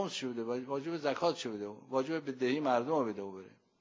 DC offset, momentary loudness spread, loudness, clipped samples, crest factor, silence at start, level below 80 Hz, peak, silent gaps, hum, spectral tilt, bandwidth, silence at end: under 0.1%; 11 LU; -35 LUFS; under 0.1%; 18 dB; 0 s; -82 dBFS; -16 dBFS; none; none; -5 dB/octave; 7.8 kHz; 0.3 s